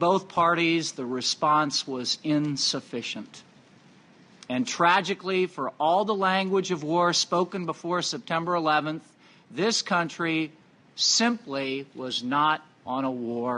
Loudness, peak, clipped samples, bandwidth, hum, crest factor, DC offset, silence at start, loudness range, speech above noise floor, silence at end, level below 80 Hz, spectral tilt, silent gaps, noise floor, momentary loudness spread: -26 LUFS; -8 dBFS; under 0.1%; 10.5 kHz; none; 20 dB; under 0.1%; 0 s; 3 LU; 29 dB; 0 s; -74 dBFS; -3.5 dB/octave; none; -55 dBFS; 11 LU